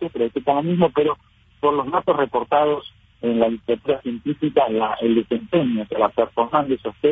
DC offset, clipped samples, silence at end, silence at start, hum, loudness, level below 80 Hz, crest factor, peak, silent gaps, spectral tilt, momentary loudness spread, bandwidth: under 0.1%; under 0.1%; 0 s; 0 s; none; -21 LUFS; -54 dBFS; 16 dB; -4 dBFS; none; -9.5 dB/octave; 5 LU; 3.9 kHz